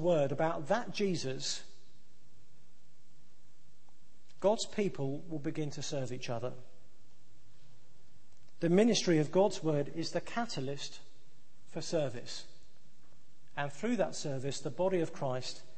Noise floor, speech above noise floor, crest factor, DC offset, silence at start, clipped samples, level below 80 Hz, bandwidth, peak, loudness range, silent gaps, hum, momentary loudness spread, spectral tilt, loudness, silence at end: -68 dBFS; 34 dB; 22 dB; 1%; 0 s; under 0.1%; -68 dBFS; 8.8 kHz; -14 dBFS; 10 LU; none; none; 14 LU; -5 dB/octave; -34 LUFS; 0.15 s